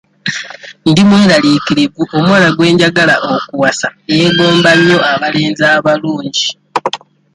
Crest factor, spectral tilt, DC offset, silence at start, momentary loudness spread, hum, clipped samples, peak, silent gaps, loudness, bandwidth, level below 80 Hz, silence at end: 10 dB; -5 dB/octave; under 0.1%; 0.25 s; 11 LU; none; under 0.1%; 0 dBFS; none; -10 LUFS; 11.5 kHz; -48 dBFS; 0.35 s